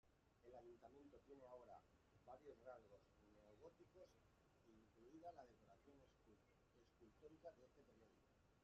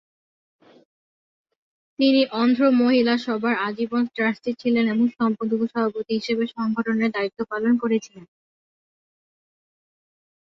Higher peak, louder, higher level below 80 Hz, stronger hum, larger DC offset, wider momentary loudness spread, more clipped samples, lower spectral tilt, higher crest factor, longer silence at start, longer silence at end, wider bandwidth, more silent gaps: second, -48 dBFS vs -8 dBFS; second, -66 LUFS vs -22 LUFS; second, -84 dBFS vs -70 dBFS; neither; neither; about the same, 6 LU vs 7 LU; neither; about the same, -5.5 dB/octave vs -6 dB/octave; about the same, 20 dB vs 16 dB; second, 0.05 s vs 2 s; second, 0 s vs 2.3 s; about the same, 7.2 kHz vs 7 kHz; neither